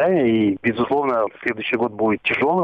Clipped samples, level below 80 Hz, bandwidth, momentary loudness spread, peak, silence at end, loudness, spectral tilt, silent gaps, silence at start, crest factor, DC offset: under 0.1%; -58 dBFS; 5.6 kHz; 5 LU; -6 dBFS; 0 s; -20 LUFS; -8 dB/octave; none; 0 s; 12 dB; under 0.1%